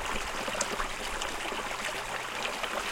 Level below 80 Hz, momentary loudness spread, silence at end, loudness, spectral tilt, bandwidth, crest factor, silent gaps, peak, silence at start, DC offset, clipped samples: -46 dBFS; 2 LU; 0 s; -33 LUFS; -1.5 dB/octave; 17 kHz; 24 dB; none; -10 dBFS; 0 s; under 0.1%; under 0.1%